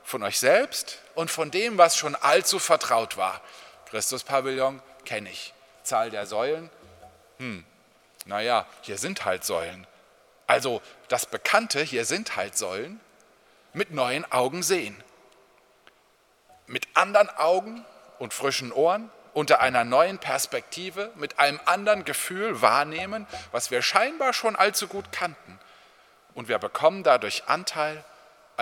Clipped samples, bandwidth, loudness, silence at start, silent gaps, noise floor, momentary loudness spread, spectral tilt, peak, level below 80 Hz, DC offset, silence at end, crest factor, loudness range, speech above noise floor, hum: under 0.1%; 18.5 kHz; -25 LUFS; 0.05 s; none; -63 dBFS; 15 LU; -2 dB/octave; -2 dBFS; -70 dBFS; under 0.1%; 0 s; 24 dB; 7 LU; 37 dB; none